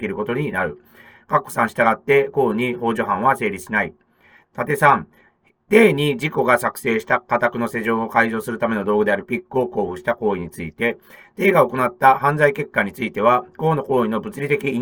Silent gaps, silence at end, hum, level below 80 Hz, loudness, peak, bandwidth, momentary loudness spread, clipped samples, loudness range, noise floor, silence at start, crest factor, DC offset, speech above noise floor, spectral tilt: none; 0 s; none; -58 dBFS; -19 LUFS; 0 dBFS; over 20 kHz; 8 LU; under 0.1%; 3 LU; -54 dBFS; 0 s; 20 dB; under 0.1%; 35 dB; -6 dB/octave